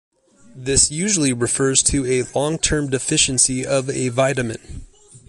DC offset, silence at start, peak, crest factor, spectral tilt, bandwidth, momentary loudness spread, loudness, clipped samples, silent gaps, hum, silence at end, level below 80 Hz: under 0.1%; 0.55 s; -2 dBFS; 18 dB; -3 dB/octave; 11.5 kHz; 7 LU; -18 LUFS; under 0.1%; none; none; 0.1 s; -38 dBFS